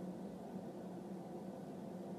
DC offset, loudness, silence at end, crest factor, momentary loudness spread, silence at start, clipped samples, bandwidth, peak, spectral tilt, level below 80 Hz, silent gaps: under 0.1%; -49 LUFS; 0 s; 12 dB; 1 LU; 0 s; under 0.1%; 15.5 kHz; -36 dBFS; -8 dB/octave; -78 dBFS; none